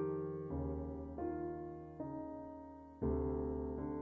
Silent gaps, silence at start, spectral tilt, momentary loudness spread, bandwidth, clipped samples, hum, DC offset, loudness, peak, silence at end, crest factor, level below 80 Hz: none; 0 s; -11.5 dB/octave; 11 LU; 2.8 kHz; under 0.1%; none; under 0.1%; -43 LUFS; -28 dBFS; 0 s; 14 dB; -52 dBFS